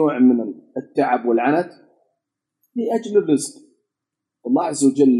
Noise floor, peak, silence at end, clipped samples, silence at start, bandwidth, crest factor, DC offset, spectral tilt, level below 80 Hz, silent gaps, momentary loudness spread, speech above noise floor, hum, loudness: -83 dBFS; -4 dBFS; 0 s; under 0.1%; 0 s; 12 kHz; 16 dB; under 0.1%; -5.5 dB/octave; -80 dBFS; none; 15 LU; 66 dB; none; -19 LUFS